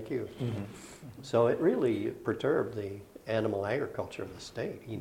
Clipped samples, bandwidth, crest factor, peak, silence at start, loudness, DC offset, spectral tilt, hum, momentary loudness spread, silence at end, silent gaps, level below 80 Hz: under 0.1%; 16.5 kHz; 18 dB; -14 dBFS; 0 s; -32 LUFS; under 0.1%; -7 dB/octave; none; 15 LU; 0 s; none; -64 dBFS